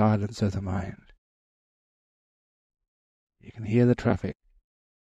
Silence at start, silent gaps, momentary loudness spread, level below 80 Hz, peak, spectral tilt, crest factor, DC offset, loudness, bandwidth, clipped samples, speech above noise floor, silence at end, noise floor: 0 s; 1.18-2.70 s, 2.88-3.27 s; 17 LU; -54 dBFS; -10 dBFS; -8.5 dB/octave; 20 dB; under 0.1%; -27 LUFS; 8.4 kHz; under 0.1%; over 65 dB; 0.8 s; under -90 dBFS